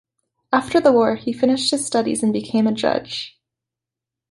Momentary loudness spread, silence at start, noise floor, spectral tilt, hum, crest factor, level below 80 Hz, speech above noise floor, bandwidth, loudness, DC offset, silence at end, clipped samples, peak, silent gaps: 9 LU; 0.5 s; -86 dBFS; -4 dB/octave; none; 18 dB; -58 dBFS; 68 dB; 11.5 kHz; -19 LUFS; under 0.1%; 1.05 s; under 0.1%; -2 dBFS; none